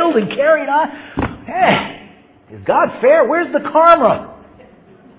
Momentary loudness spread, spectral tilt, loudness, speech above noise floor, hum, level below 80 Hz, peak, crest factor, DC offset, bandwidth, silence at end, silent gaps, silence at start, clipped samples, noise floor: 13 LU; -9 dB/octave; -14 LUFS; 31 dB; none; -44 dBFS; 0 dBFS; 16 dB; under 0.1%; 4 kHz; 0.85 s; none; 0 s; under 0.1%; -44 dBFS